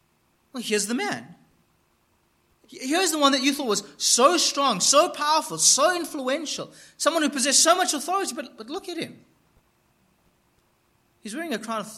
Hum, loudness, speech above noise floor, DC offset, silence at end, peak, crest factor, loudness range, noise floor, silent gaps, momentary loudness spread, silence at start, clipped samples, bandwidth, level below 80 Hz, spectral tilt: none; -21 LUFS; 43 dB; under 0.1%; 0 s; -4 dBFS; 20 dB; 14 LU; -66 dBFS; none; 18 LU; 0.55 s; under 0.1%; 16 kHz; -74 dBFS; -1 dB/octave